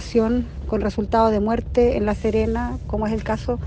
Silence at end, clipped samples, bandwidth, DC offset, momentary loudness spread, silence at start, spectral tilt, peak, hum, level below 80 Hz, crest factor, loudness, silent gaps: 0 s; under 0.1%; 8.8 kHz; under 0.1%; 7 LU; 0 s; -7.5 dB/octave; -6 dBFS; none; -32 dBFS; 14 dB; -21 LUFS; none